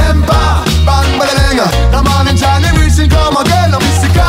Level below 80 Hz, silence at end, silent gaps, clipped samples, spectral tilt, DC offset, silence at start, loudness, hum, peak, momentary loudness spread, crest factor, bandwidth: -12 dBFS; 0 s; none; under 0.1%; -5 dB/octave; under 0.1%; 0 s; -10 LUFS; none; 0 dBFS; 1 LU; 8 dB; 16 kHz